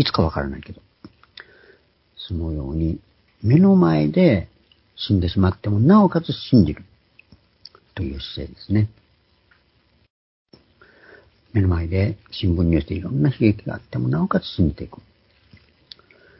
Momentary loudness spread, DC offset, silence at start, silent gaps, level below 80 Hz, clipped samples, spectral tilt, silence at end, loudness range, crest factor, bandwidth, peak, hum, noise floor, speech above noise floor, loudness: 17 LU; under 0.1%; 0 s; 10.10-10.45 s; -36 dBFS; under 0.1%; -11.5 dB/octave; 1.45 s; 12 LU; 20 dB; 5.8 kHz; -2 dBFS; none; -61 dBFS; 42 dB; -20 LUFS